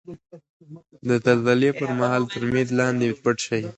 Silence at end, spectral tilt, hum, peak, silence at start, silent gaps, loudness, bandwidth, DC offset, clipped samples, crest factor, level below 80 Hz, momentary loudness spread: 0.05 s; -6 dB/octave; none; -4 dBFS; 0.1 s; 0.50-0.60 s; -22 LUFS; 8.4 kHz; under 0.1%; under 0.1%; 18 dB; -60 dBFS; 6 LU